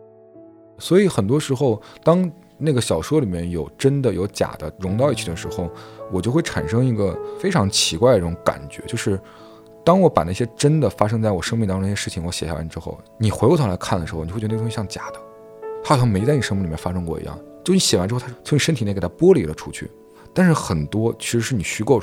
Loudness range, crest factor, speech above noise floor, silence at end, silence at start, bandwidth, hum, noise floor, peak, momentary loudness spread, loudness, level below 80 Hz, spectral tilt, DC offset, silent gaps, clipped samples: 3 LU; 20 dB; 26 dB; 0 s; 0.35 s; 16.5 kHz; none; -45 dBFS; 0 dBFS; 12 LU; -20 LUFS; -44 dBFS; -5.5 dB/octave; under 0.1%; none; under 0.1%